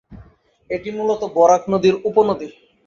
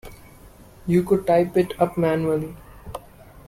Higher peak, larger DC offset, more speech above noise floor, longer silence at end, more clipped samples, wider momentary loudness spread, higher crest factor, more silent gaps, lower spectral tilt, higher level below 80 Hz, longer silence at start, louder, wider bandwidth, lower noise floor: first, -2 dBFS vs -6 dBFS; neither; first, 32 dB vs 26 dB; first, 0.35 s vs 0.1 s; neither; second, 13 LU vs 19 LU; about the same, 18 dB vs 16 dB; neither; second, -6 dB/octave vs -8 dB/octave; about the same, -52 dBFS vs -48 dBFS; about the same, 0.1 s vs 0.05 s; first, -18 LUFS vs -21 LUFS; second, 7.4 kHz vs 16 kHz; about the same, -49 dBFS vs -47 dBFS